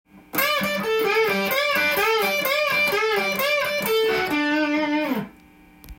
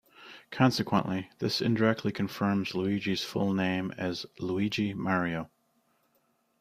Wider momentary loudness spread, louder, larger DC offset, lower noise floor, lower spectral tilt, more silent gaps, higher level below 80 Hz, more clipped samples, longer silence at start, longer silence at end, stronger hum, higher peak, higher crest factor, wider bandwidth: second, 4 LU vs 9 LU; first, -21 LUFS vs -30 LUFS; neither; second, -50 dBFS vs -72 dBFS; second, -3 dB/octave vs -6 dB/octave; neither; first, -56 dBFS vs -64 dBFS; neither; about the same, 0.15 s vs 0.2 s; second, 0.05 s vs 1.15 s; neither; about the same, -8 dBFS vs -10 dBFS; second, 14 dB vs 22 dB; about the same, 17 kHz vs 15.5 kHz